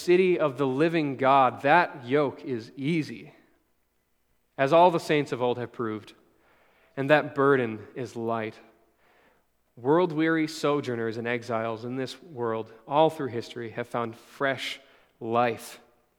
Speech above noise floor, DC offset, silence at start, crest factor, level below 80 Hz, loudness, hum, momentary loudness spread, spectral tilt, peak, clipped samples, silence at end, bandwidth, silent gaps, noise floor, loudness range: 47 dB; under 0.1%; 0 s; 24 dB; -76 dBFS; -26 LUFS; none; 15 LU; -6 dB/octave; -4 dBFS; under 0.1%; 0.4 s; 16.5 kHz; none; -73 dBFS; 4 LU